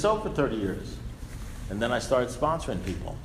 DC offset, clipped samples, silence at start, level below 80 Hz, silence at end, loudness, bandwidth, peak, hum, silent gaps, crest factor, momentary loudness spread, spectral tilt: under 0.1%; under 0.1%; 0 s; -40 dBFS; 0 s; -29 LUFS; 15.5 kHz; -12 dBFS; none; none; 18 dB; 15 LU; -5.5 dB/octave